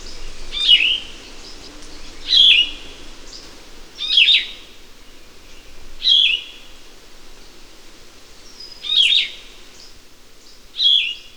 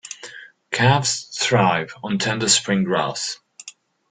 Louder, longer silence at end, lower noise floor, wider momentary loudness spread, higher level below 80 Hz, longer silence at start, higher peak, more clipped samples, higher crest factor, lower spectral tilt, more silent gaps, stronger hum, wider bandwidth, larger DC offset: first, -13 LUFS vs -20 LUFS; second, 0.15 s vs 0.4 s; about the same, -44 dBFS vs -45 dBFS; first, 26 LU vs 20 LU; first, -40 dBFS vs -56 dBFS; about the same, 0 s vs 0.05 s; about the same, 0 dBFS vs -2 dBFS; neither; about the same, 20 dB vs 18 dB; second, 0.5 dB/octave vs -3.5 dB/octave; neither; neither; first, over 20 kHz vs 9.8 kHz; first, 0.6% vs under 0.1%